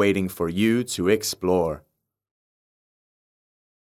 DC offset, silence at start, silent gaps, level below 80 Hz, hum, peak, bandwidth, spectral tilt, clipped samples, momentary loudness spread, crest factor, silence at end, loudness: under 0.1%; 0 s; none; -50 dBFS; none; -6 dBFS; 16 kHz; -5 dB/octave; under 0.1%; 5 LU; 18 dB; 2.1 s; -23 LUFS